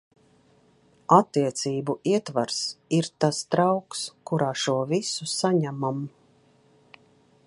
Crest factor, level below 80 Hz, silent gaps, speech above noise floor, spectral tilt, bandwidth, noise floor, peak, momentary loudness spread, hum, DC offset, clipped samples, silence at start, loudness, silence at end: 24 dB; -72 dBFS; none; 36 dB; -5 dB/octave; 11.5 kHz; -60 dBFS; -4 dBFS; 10 LU; none; under 0.1%; under 0.1%; 1.1 s; -25 LUFS; 1.4 s